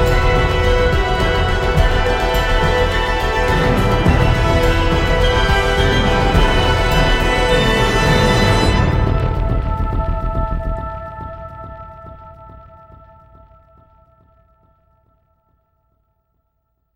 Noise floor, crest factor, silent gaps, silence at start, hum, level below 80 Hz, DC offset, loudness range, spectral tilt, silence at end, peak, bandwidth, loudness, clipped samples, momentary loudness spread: -68 dBFS; 14 dB; none; 0 s; none; -20 dBFS; under 0.1%; 13 LU; -5.5 dB/octave; 4.35 s; -2 dBFS; 15.5 kHz; -16 LUFS; under 0.1%; 14 LU